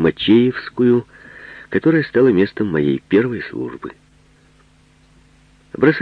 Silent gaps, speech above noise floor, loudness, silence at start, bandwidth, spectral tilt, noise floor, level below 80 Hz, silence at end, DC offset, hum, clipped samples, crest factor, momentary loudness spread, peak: none; 36 dB; -17 LUFS; 0 s; 5.4 kHz; -8.5 dB/octave; -52 dBFS; -52 dBFS; 0 s; under 0.1%; none; under 0.1%; 18 dB; 22 LU; 0 dBFS